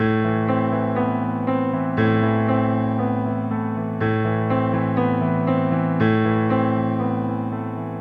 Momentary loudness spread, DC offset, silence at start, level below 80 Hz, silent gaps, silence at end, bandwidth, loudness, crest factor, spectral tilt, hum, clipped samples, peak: 5 LU; under 0.1%; 0 s; -52 dBFS; none; 0 s; 4.8 kHz; -21 LUFS; 16 dB; -10.5 dB/octave; none; under 0.1%; -4 dBFS